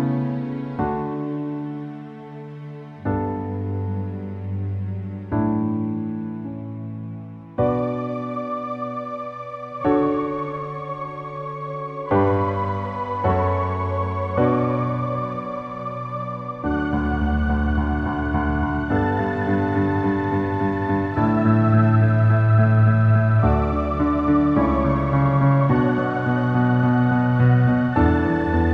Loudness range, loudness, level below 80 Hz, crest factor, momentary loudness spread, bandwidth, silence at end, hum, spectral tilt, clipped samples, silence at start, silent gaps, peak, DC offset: 9 LU; -21 LUFS; -34 dBFS; 16 dB; 14 LU; 4.8 kHz; 0 s; none; -10.5 dB/octave; under 0.1%; 0 s; none; -4 dBFS; under 0.1%